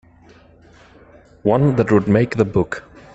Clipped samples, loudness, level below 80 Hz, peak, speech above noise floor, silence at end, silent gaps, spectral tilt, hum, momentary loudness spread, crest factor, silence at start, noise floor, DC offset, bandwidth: under 0.1%; -17 LUFS; -46 dBFS; -2 dBFS; 32 dB; 0.35 s; none; -8.5 dB/octave; none; 9 LU; 18 dB; 1.45 s; -48 dBFS; under 0.1%; 8.2 kHz